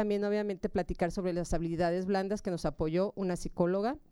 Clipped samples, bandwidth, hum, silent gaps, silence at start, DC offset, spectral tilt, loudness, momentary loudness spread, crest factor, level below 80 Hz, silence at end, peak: under 0.1%; 12.5 kHz; none; none; 0 s; under 0.1%; -6.5 dB/octave; -33 LUFS; 4 LU; 14 dB; -46 dBFS; 0.1 s; -16 dBFS